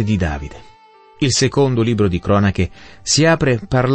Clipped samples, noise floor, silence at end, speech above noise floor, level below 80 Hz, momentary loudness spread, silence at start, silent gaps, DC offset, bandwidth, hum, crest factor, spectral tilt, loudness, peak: under 0.1%; -46 dBFS; 0 s; 30 dB; -36 dBFS; 10 LU; 0 s; none; under 0.1%; 8.8 kHz; none; 14 dB; -5 dB/octave; -16 LUFS; -2 dBFS